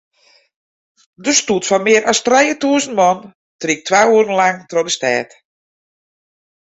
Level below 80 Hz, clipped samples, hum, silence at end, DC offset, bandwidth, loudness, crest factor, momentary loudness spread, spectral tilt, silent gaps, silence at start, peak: -60 dBFS; under 0.1%; none; 1.45 s; under 0.1%; 8.2 kHz; -14 LUFS; 16 dB; 8 LU; -2.5 dB/octave; 3.35-3.59 s; 1.2 s; 0 dBFS